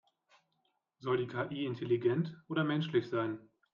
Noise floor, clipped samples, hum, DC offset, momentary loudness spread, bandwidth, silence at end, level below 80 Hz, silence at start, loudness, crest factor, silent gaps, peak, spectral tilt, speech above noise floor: -80 dBFS; under 0.1%; none; under 0.1%; 7 LU; 6.8 kHz; 0.3 s; -76 dBFS; 1 s; -35 LUFS; 18 dB; none; -18 dBFS; -8.5 dB/octave; 46 dB